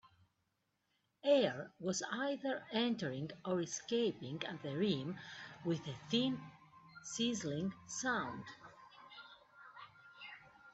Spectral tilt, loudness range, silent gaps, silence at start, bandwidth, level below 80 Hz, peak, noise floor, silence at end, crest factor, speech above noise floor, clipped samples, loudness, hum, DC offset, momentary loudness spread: -4 dB/octave; 5 LU; none; 1.25 s; 8.2 kHz; -78 dBFS; -20 dBFS; -83 dBFS; 0.05 s; 20 dB; 45 dB; under 0.1%; -39 LUFS; none; under 0.1%; 20 LU